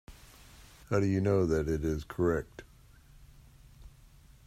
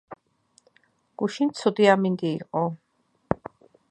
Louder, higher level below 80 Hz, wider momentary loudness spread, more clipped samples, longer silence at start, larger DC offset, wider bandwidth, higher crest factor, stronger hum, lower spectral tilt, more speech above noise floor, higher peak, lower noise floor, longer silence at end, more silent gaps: second, -31 LUFS vs -25 LUFS; first, -50 dBFS vs -58 dBFS; second, 9 LU vs 12 LU; neither; about the same, 0.1 s vs 0.1 s; neither; first, 15 kHz vs 9.6 kHz; about the same, 20 dB vs 24 dB; neither; about the same, -7.5 dB/octave vs -6.5 dB/octave; second, 28 dB vs 42 dB; second, -14 dBFS vs -4 dBFS; second, -57 dBFS vs -65 dBFS; about the same, 0.6 s vs 0.55 s; neither